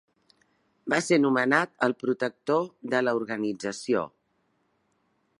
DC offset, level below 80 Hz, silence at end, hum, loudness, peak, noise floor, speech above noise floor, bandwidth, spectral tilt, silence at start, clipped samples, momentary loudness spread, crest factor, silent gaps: under 0.1%; -76 dBFS; 1.3 s; none; -26 LUFS; -6 dBFS; -72 dBFS; 46 dB; 11.5 kHz; -5 dB/octave; 0.85 s; under 0.1%; 8 LU; 22 dB; none